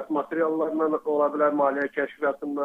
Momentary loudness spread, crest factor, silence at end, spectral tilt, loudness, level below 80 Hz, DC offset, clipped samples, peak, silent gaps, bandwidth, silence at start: 6 LU; 14 dB; 0 s; -7.5 dB/octave; -25 LUFS; -74 dBFS; under 0.1%; under 0.1%; -10 dBFS; none; 4.8 kHz; 0 s